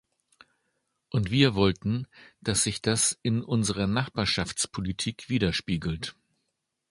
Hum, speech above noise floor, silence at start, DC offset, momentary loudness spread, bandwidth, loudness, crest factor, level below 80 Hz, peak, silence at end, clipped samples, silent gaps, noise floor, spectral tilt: none; 53 dB; 1.15 s; under 0.1%; 10 LU; 11.5 kHz; -27 LUFS; 22 dB; -48 dBFS; -6 dBFS; 0.8 s; under 0.1%; none; -80 dBFS; -4 dB/octave